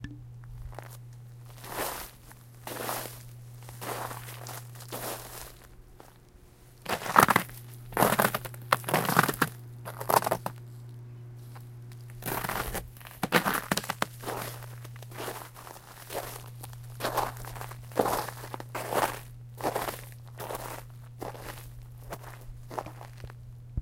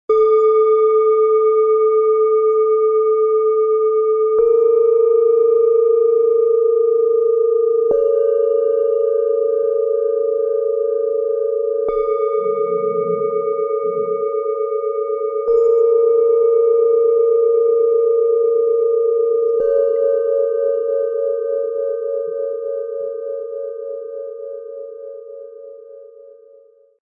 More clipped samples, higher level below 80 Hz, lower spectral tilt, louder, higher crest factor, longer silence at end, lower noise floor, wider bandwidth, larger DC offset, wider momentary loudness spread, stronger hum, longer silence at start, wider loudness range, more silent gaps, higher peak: neither; first, -54 dBFS vs -60 dBFS; second, -4 dB/octave vs -8.5 dB/octave; second, -31 LUFS vs -16 LUFS; first, 32 dB vs 10 dB; second, 0 s vs 0.75 s; first, -55 dBFS vs -49 dBFS; first, 17 kHz vs 2.4 kHz; neither; first, 20 LU vs 11 LU; neither; about the same, 0 s vs 0.1 s; first, 13 LU vs 10 LU; neither; first, 0 dBFS vs -6 dBFS